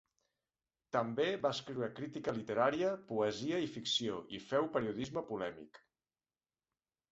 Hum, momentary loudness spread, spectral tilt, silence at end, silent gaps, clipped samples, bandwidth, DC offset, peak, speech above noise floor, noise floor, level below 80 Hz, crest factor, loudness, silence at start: none; 8 LU; -3.5 dB/octave; 1.35 s; none; under 0.1%; 8 kHz; under 0.1%; -18 dBFS; over 53 dB; under -90 dBFS; -74 dBFS; 22 dB; -37 LUFS; 0.95 s